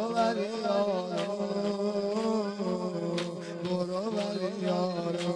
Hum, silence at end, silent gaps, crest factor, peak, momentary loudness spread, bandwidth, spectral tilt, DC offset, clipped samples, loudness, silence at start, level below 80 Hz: none; 0 s; none; 16 dB; -16 dBFS; 4 LU; 10.5 kHz; -6 dB/octave; under 0.1%; under 0.1%; -31 LUFS; 0 s; -74 dBFS